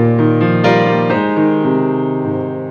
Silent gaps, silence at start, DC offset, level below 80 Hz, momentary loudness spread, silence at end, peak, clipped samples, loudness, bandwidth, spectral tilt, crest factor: none; 0 s; under 0.1%; -54 dBFS; 6 LU; 0 s; 0 dBFS; under 0.1%; -14 LUFS; 6.8 kHz; -8.5 dB/octave; 14 dB